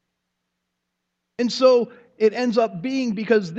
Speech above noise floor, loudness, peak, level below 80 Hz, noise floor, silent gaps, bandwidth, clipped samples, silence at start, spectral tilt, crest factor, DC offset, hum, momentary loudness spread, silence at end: 59 dB; -21 LUFS; -4 dBFS; -74 dBFS; -78 dBFS; none; 8 kHz; under 0.1%; 1.4 s; -5.5 dB/octave; 18 dB; under 0.1%; none; 10 LU; 0 s